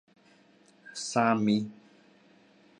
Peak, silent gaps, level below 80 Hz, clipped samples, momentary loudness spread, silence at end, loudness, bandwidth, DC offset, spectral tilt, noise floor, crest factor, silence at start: -10 dBFS; none; -76 dBFS; under 0.1%; 17 LU; 1.05 s; -28 LUFS; 11 kHz; under 0.1%; -5 dB/octave; -61 dBFS; 22 dB; 0.85 s